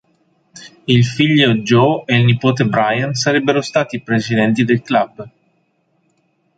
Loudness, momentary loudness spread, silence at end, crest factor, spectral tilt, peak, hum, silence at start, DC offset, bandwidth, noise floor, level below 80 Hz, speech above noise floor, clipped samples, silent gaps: -15 LUFS; 6 LU; 1.3 s; 16 dB; -6 dB/octave; 0 dBFS; none; 0.55 s; under 0.1%; 9 kHz; -62 dBFS; -52 dBFS; 48 dB; under 0.1%; none